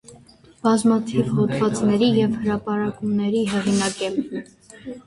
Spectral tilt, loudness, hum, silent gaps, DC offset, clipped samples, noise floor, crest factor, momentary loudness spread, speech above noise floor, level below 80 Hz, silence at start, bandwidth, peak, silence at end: -5.5 dB/octave; -21 LUFS; none; none; under 0.1%; under 0.1%; -49 dBFS; 16 dB; 9 LU; 29 dB; -54 dBFS; 0.1 s; 11.5 kHz; -6 dBFS; 0.05 s